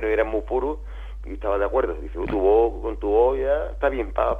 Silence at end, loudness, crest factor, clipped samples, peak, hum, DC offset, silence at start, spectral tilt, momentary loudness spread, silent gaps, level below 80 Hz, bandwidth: 0 s; -23 LUFS; 14 dB; under 0.1%; -8 dBFS; none; under 0.1%; 0 s; -8.5 dB/octave; 12 LU; none; -34 dBFS; 4.3 kHz